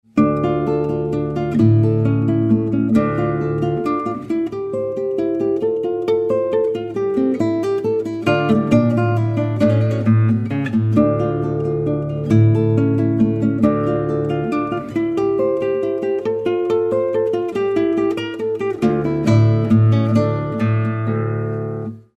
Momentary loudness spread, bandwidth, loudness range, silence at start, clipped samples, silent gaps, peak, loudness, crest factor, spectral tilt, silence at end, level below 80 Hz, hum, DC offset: 7 LU; 8 kHz; 3 LU; 0.15 s; under 0.1%; none; -2 dBFS; -18 LUFS; 16 dB; -9.5 dB/octave; 0.15 s; -46 dBFS; none; under 0.1%